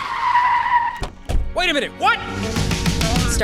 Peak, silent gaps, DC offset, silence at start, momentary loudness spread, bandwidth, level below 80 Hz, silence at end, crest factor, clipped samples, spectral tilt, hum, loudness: -6 dBFS; none; under 0.1%; 0 s; 9 LU; 16.5 kHz; -28 dBFS; 0 s; 14 dB; under 0.1%; -4 dB/octave; none; -19 LUFS